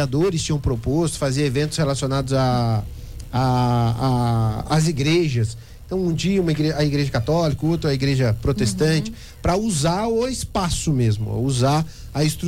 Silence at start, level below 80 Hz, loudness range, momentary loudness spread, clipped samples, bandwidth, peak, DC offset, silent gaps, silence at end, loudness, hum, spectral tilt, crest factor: 0 s; -36 dBFS; 1 LU; 5 LU; under 0.1%; 16 kHz; -10 dBFS; under 0.1%; none; 0 s; -21 LUFS; none; -6 dB/octave; 10 dB